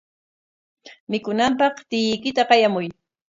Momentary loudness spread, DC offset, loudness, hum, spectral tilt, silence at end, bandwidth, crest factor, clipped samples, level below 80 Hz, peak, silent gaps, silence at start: 11 LU; under 0.1%; -20 LUFS; none; -4.5 dB/octave; 0.4 s; 7.8 kHz; 22 dB; under 0.1%; -62 dBFS; -2 dBFS; 1.00-1.07 s; 0.85 s